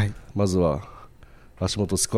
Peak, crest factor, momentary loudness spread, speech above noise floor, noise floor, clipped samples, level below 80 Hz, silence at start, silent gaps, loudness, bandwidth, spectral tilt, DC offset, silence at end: -8 dBFS; 16 dB; 10 LU; 24 dB; -48 dBFS; under 0.1%; -44 dBFS; 0 s; none; -25 LUFS; 14 kHz; -5 dB/octave; under 0.1%; 0 s